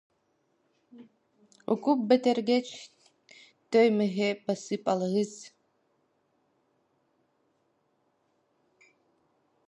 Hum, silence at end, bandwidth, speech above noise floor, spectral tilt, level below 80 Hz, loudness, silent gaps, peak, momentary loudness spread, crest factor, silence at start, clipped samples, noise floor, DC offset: none; 4.2 s; 11 kHz; 46 dB; -5.5 dB/octave; -82 dBFS; -27 LUFS; none; -10 dBFS; 16 LU; 22 dB; 0.95 s; under 0.1%; -73 dBFS; under 0.1%